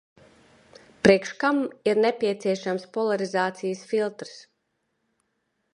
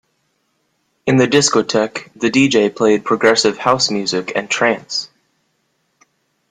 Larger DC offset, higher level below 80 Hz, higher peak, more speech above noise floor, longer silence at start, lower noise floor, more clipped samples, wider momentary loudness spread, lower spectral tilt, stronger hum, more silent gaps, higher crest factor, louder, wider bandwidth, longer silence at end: neither; about the same, -62 dBFS vs -58 dBFS; about the same, -2 dBFS vs 0 dBFS; about the same, 51 dB vs 51 dB; about the same, 1.05 s vs 1.05 s; first, -76 dBFS vs -66 dBFS; neither; about the same, 11 LU vs 10 LU; first, -5.5 dB/octave vs -3.5 dB/octave; neither; neither; first, 24 dB vs 16 dB; second, -24 LUFS vs -15 LUFS; about the same, 11 kHz vs 10 kHz; about the same, 1.35 s vs 1.45 s